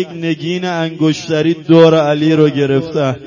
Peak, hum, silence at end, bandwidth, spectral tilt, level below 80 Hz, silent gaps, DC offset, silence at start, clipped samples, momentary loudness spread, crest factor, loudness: 0 dBFS; none; 0 s; 7.4 kHz; -7 dB/octave; -54 dBFS; none; under 0.1%; 0 s; under 0.1%; 10 LU; 12 dB; -13 LUFS